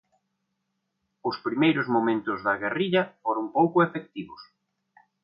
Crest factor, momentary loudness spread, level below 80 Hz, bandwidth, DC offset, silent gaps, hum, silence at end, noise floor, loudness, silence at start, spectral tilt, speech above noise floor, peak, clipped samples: 18 dB; 13 LU; -70 dBFS; 5.4 kHz; under 0.1%; none; none; 0.8 s; -79 dBFS; -25 LUFS; 1.25 s; -9.5 dB/octave; 54 dB; -8 dBFS; under 0.1%